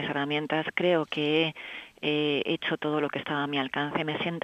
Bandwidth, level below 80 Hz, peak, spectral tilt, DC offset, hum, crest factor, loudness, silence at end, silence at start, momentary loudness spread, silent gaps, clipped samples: 8.8 kHz; -70 dBFS; -12 dBFS; -6.5 dB/octave; under 0.1%; none; 18 dB; -28 LUFS; 0.05 s; 0 s; 5 LU; none; under 0.1%